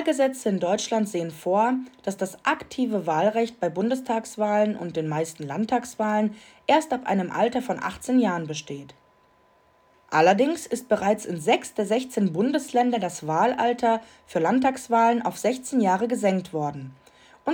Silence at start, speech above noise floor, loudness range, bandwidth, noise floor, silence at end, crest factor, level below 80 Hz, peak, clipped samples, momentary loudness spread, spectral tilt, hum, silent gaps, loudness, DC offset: 0 s; 36 dB; 3 LU; over 20 kHz; -60 dBFS; 0 s; 20 dB; -66 dBFS; -6 dBFS; under 0.1%; 8 LU; -5 dB/octave; none; none; -24 LUFS; under 0.1%